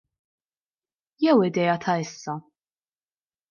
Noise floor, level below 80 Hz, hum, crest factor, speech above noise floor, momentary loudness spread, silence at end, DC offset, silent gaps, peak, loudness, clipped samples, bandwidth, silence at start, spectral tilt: under -90 dBFS; -74 dBFS; none; 18 dB; over 67 dB; 15 LU; 1.1 s; under 0.1%; none; -8 dBFS; -23 LUFS; under 0.1%; 7.2 kHz; 1.2 s; -6 dB/octave